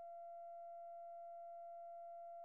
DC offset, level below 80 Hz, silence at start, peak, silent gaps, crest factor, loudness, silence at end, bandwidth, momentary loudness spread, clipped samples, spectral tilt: under 0.1%; under -90 dBFS; 0 s; -50 dBFS; none; 4 dB; -54 LUFS; 0 s; 2.8 kHz; 0 LU; under 0.1%; 3.5 dB/octave